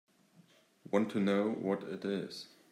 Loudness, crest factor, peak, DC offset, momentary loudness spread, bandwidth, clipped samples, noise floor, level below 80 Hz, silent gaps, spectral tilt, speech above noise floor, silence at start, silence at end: -35 LUFS; 20 dB; -16 dBFS; under 0.1%; 10 LU; 13 kHz; under 0.1%; -65 dBFS; -82 dBFS; none; -7 dB/octave; 31 dB; 0.9 s; 0.25 s